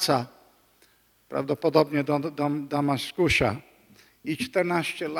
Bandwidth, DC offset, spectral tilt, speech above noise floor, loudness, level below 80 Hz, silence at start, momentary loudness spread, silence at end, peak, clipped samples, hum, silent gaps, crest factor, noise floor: 17.5 kHz; under 0.1%; -5 dB/octave; 37 dB; -26 LUFS; -52 dBFS; 0 s; 12 LU; 0 s; -6 dBFS; under 0.1%; none; none; 22 dB; -62 dBFS